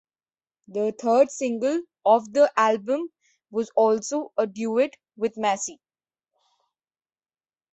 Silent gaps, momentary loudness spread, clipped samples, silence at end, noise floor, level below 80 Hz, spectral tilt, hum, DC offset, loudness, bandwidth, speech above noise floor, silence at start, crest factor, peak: none; 10 LU; under 0.1%; 2 s; under -90 dBFS; -74 dBFS; -4 dB/octave; none; under 0.1%; -24 LUFS; 8.2 kHz; over 67 dB; 0.7 s; 20 dB; -6 dBFS